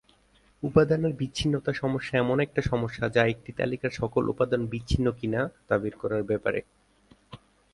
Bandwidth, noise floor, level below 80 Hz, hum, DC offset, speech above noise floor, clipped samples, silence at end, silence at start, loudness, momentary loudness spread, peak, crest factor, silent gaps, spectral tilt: 11.5 kHz; -62 dBFS; -46 dBFS; none; under 0.1%; 36 dB; under 0.1%; 0.35 s; 0.6 s; -27 LUFS; 6 LU; -8 dBFS; 20 dB; none; -6.5 dB/octave